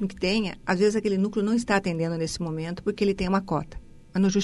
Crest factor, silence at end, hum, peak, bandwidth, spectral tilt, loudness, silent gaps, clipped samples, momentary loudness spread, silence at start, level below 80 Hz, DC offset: 18 dB; 0 s; none; -8 dBFS; 11.5 kHz; -5.5 dB/octave; -26 LUFS; none; under 0.1%; 7 LU; 0 s; -46 dBFS; under 0.1%